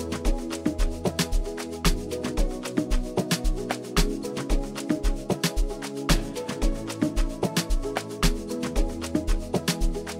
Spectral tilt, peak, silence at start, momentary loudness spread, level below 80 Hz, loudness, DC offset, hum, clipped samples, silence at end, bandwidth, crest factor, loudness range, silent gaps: -4.5 dB/octave; -6 dBFS; 0 s; 4 LU; -28 dBFS; -28 LUFS; under 0.1%; none; under 0.1%; 0 s; 16 kHz; 20 dB; 1 LU; none